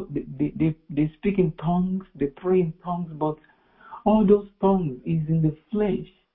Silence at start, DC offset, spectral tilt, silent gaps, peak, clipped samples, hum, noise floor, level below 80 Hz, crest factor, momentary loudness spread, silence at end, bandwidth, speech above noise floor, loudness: 0 s; under 0.1%; -13 dB/octave; none; -6 dBFS; under 0.1%; none; -47 dBFS; -48 dBFS; 18 dB; 10 LU; 0.3 s; 3.9 kHz; 24 dB; -24 LUFS